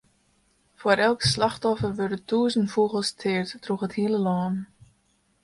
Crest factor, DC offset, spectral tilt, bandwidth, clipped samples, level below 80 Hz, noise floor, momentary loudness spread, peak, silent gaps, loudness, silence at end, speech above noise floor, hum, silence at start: 20 dB; under 0.1%; -5 dB/octave; 11.5 kHz; under 0.1%; -56 dBFS; -67 dBFS; 9 LU; -6 dBFS; none; -25 LUFS; 0.8 s; 43 dB; none; 0.8 s